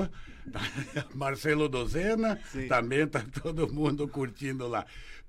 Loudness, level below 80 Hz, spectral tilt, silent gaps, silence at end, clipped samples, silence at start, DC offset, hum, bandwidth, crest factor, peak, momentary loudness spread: -31 LUFS; -44 dBFS; -6 dB/octave; none; 0 s; under 0.1%; 0 s; under 0.1%; none; 15.5 kHz; 16 dB; -14 dBFS; 9 LU